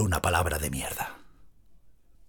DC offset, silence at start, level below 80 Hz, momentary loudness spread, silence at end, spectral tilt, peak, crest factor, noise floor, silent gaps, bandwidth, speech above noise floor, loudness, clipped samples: under 0.1%; 0 s; -44 dBFS; 10 LU; 0.05 s; -4 dB/octave; -10 dBFS; 22 dB; -55 dBFS; none; 19.5 kHz; 27 dB; -29 LUFS; under 0.1%